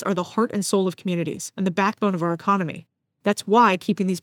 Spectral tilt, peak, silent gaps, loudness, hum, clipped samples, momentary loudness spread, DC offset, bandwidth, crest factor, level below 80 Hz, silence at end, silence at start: -5.5 dB/octave; -4 dBFS; none; -22 LUFS; none; under 0.1%; 10 LU; under 0.1%; 17 kHz; 18 dB; -72 dBFS; 0.05 s; 0 s